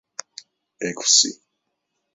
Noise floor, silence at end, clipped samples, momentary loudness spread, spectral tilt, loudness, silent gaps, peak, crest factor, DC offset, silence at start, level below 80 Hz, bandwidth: -77 dBFS; 0.8 s; under 0.1%; 21 LU; 0 dB/octave; -17 LUFS; none; -2 dBFS; 24 dB; under 0.1%; 0.8 s; -76 dBFS; 8.2 kHz